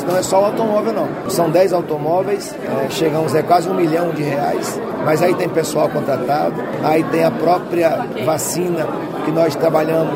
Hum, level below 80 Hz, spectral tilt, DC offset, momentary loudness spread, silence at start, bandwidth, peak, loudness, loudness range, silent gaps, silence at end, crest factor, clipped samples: none; -54 dBFS; -5.5 dB/octave; under 0.1%; 6 LU; 0 s; 16.5 kHz; 0 dBFS; -17 LUFS; 1 LU; none; 0 s; 16 dB; under 0.1%